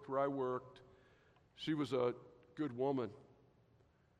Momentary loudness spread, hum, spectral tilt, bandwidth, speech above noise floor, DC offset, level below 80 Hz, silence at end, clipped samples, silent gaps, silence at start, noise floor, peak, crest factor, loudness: 13 LU; none; -7 dB/octave; 10 kHz; 32 dB; under 0.1%; -78 dBFS; 0.95 s; under 0.1%; none; 0 s; -71 dBFS; -24 dBFS; 18 dB; -40 LUFS